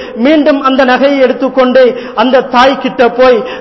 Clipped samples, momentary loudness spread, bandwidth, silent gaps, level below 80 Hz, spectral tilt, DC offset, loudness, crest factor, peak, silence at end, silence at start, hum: 0.4%; 3 LU; 6 kHz; none; -44 dBFS; -5 dB/octave; under 0.1%; -8 LUFS; 8 dB; 0 dBFS; 0 s; 0 s; none